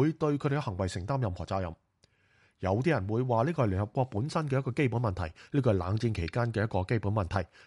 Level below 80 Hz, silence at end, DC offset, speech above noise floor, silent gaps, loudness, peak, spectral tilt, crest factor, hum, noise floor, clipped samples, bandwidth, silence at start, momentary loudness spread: -52 dBFS; 0.2 s; under 0.1%; 39 dB; none; -31 LUFS; -14 dBFS; -7.5 dB/octave; 16 dB; none; -68 dBFS; under 0.1%; 11.5 kHz; 0 s; 6 LU